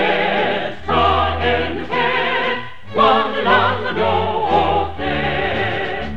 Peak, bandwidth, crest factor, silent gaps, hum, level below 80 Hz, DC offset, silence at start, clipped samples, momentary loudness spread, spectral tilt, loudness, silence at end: -2 dBFS; 8.4 kHz; 16 dB; none; none; -38 dBFS; 3%; 0 s; under 0.1%; 7 LU; -6.5 dB/octave; -17 LUFS; 0 s